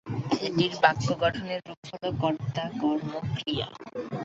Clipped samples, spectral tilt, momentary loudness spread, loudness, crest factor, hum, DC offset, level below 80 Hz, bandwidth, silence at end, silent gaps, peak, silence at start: under 0.1%; -6 dB/octave; 13 LU; -28 LUFS; 24 dB; none; under 0.1%; -56 dBFS; 8 kHz; 0 s; 1.77-1.83 s; -4 dBFS; 0.05 s